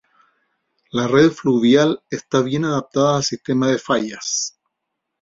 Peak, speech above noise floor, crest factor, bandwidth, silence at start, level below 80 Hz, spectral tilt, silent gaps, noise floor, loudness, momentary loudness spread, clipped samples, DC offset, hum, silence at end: -2 dBFS; 61 dB; 18 dB; 7.8 kHz; 0.95 s; -58 dBFS; -4.5 dB/octave; none; -78 dBFS; -18 LUFS; 8 LU; under 0.1%; under 0.1%; none; 0.7 s